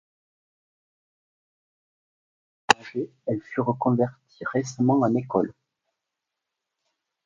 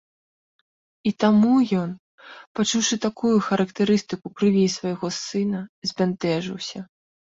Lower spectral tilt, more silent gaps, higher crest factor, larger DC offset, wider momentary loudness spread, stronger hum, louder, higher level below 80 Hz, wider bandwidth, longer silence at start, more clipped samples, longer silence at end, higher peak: about the same, -5.5 dB/octave vs -5 dB/octave; second, none vs 1.99-2.18 s, 2.47-2.55 s, 5.69-5.82 s; first, 28 dB vs 18 dB; neither; second, 10 LU vs 14 LU; neither; second, -25 LUFS vs -22 LUFS; about the same, -68 dBFS vs -64 dBFS; first, 11.5 kHz vs 7.8 kHz; first, 2.7 s vs 1.05 s; neither; first, 1.75 s vs 0.55 s; first, 0 dBFS vs -6 dBFS